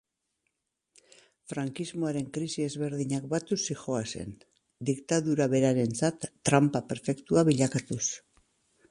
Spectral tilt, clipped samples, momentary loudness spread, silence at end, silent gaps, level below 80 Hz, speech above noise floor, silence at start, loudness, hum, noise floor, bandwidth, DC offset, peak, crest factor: -5.5 dB/octave; under 0.1%; 11 LU; 0.7 s; none; -64 dBFS; 52 dB; 1.5 s; -29 LUFS; none; -81 dBFS; 11.5 kHz; under 0.1%; -8 dBFS; 22 dB